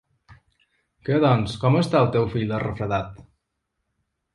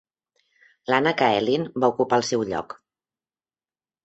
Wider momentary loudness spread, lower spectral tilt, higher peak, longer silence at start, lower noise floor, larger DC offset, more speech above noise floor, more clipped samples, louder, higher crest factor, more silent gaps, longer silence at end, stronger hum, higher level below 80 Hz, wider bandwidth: second, 8 LU vs 17 LU; first, -7.5 dB/octave vs -4.5 dB/octave; about the same, -6 dBFS vs -4 dBFS; second, 0.3 s vs 0.9 s; second, -78 dBFS vs under -90 dBFS; neither; second, 57 dB vs over 68 dB; neither; about the same, -22 LUFS vs -22 LUFS; about the same, 20 dB vs 20 dB; neither; second, 1.15 s vs 1.3 s; neither; first, -50 dBFS vs -64 dBFS; first, 11.5 kHz vs 8.2 kHz